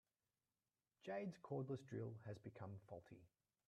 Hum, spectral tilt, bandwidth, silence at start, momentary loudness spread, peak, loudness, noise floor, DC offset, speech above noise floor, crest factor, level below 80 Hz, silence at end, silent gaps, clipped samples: none; -8 dB/octave; 11 kHz; 1.05 s; 11 LU; -38 dBFS; -53 LUFS; under -90 dBFS; under 0.1%; over 38 dB; 16 dB; -86 dBFS; 0.4 s; none; under 0.1%